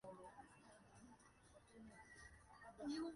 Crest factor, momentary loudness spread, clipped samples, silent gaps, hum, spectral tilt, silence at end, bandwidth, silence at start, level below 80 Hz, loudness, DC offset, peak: 18 dB; 16 LU; under 0.1%; none; none; -4.5 dB/octave; 0 s; 11 kHz; 0.05 s; -76 dBFS; -59 LUFS; under 0.1%; -40 dBFS